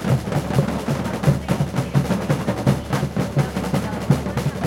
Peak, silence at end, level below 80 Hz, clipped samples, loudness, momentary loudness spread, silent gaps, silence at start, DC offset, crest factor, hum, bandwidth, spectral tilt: -4 dBFS; 0 s; -38 dBFS; under 0.1%; -22 LUFS; 3 LU; none; 0 s; under 0.1%; 18 dB; none; 16.5 kHz; -7 dB/octave